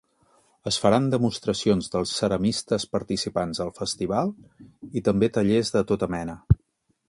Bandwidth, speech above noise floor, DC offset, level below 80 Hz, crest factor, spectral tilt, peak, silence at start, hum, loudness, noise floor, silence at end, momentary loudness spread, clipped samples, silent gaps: 11.5 kHz; 46 dB; under 0.1%; -42 dBFS; 22 dB; -5.5 dB/octave; -4 dBFS; 0.65 s; none; -25 LUFS; -70 dBFS; 0.55 s; 8 LU; under 0.1%; none